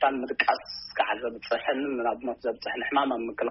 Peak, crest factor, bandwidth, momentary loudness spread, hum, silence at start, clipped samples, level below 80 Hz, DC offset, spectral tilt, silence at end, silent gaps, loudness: -8 dBFS; 20 dB; 6 kHz; 6 LU; none; 0 s; under 0.1%; -64 dBFS; under 0.1%; -0.5 dB/octave; 0 s; none; -28 LUFS